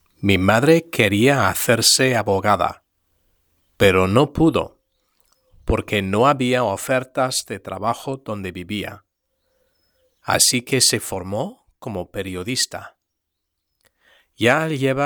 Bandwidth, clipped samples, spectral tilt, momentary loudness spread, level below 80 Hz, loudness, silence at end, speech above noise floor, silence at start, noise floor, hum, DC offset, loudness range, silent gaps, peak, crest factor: over 20 kHz; under 0.1%; -3.5 dB/octave; 14 LU; -44 dBFS; -18 LUFS; 0 s; 59 dB; 0.2 s; -78 dBFS; none; under 0.1%; 8 LU; none; 0 dBFS; 20 dB